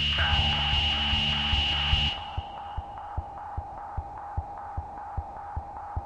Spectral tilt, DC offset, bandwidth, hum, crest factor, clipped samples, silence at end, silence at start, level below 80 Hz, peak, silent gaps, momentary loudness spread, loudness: -4 dB/octave; under 0.1%; 9.2 kHz; none; 18 dB; under 0.1%; 0 s; 0 s; -36 dBFS; -12 dBFS; none; 15 LU; -27 LUFS